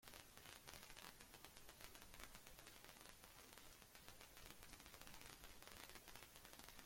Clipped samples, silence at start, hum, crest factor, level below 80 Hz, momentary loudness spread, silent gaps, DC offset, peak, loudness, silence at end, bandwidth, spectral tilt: under 0.1%; 0 s; none; 28 dB; -72 dBFS; 3 LU; none; under 0.1%; -34 dBFS; -61 LUFS; 0 s; 16.5 kHz; -2 dB/octave